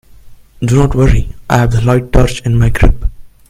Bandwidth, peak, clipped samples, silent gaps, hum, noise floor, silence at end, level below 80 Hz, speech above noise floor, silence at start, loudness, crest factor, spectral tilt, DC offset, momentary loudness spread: 14.5 kHz; 0 dBFS; 0.1%; none; none; -35 dBFS; 0.25 s; -16 dBFS; 26 dB; 0.25 s; -12 LUFS; 10 dB; -7 dB/octave; under 0.1%; 7 LU